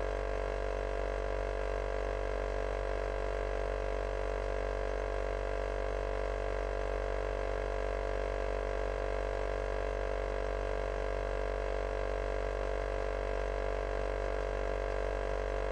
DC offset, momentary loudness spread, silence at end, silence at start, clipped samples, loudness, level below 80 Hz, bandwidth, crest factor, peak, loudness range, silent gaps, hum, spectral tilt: under 0.1%; 0 LU; 0 s; 0 s; under 0.1%; -36 LUFS; -38 dBFS; 9.2 kHz; 12 dB; -22 dBFS; 0 LU; none; none; -6 dB/octave